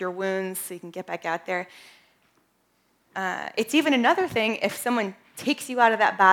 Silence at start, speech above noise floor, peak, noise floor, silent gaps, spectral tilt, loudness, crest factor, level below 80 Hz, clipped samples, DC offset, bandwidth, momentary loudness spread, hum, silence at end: 0 s; 44 dB; -2 dBFS; -68 dBFS; none; -3.5 dB/octave; -25 LUFS; 22 dB; -70 dBFS; under 0.1%; under 0.1%; 19.5 kHz; 13 LU; none; 0 s